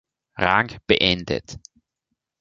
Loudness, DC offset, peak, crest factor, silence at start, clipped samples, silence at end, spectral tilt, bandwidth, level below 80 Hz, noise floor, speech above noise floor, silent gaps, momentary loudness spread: -21 LUFS; under 0.1%; 0 dBFS; 24 dB; 0.35 s; under 0.1%; 0.8 s; -4.5 dB/octave; 7.8 kHz; -46 dBFS; -80 dBFS; 58 dB; none; 23 LU